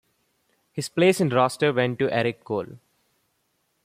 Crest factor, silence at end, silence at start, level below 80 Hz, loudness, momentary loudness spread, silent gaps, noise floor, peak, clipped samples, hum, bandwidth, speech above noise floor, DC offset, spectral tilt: 18 dB; 1.1 s; 0.75 s; -66 dBFS; -23 LUFS; 13 LU; none; -72 dBFS; -6 dBFS; under 0.1%; none; 15.5 kHz; 49 dB; under 0.1%; -5.5 dB/octave